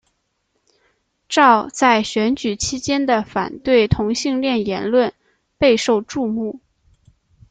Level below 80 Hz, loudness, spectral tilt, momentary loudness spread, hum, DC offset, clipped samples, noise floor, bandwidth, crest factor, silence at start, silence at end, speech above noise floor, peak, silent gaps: -44 dBFS; -18 LUFS; -4.5 dB/octave; 9 LU; none; under 0.1%; under 0.1%; -70 dBFS; 9.4 kHz; 18 dB; 1.3 s; 0.95 s; 52 dB; 0 dBFS; none